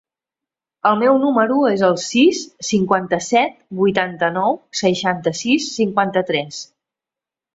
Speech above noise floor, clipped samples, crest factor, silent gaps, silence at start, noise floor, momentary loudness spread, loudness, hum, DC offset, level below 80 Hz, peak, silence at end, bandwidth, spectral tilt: 71 dB; under 0.1%; 16 dB; none; 0.85 s; -88 dBFS; 6 LU; -17 LUFS; none; under 0.1%; -60 dBFS; -2 dBFS; 0.9 s; 8 kHz; -4.5 dB/octave